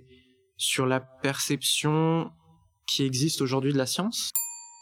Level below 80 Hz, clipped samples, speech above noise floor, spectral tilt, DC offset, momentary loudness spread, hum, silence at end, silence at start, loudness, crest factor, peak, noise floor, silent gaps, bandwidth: -70 dBFS; under 0.1%; 33 dB; -4 dB/octave; under 0.1%; 6 LU; none; 0.05 s; 0.6 s; -26 LUFS; 18 dB; -10 dBFS; -59 dBFS; none; over 20 kHz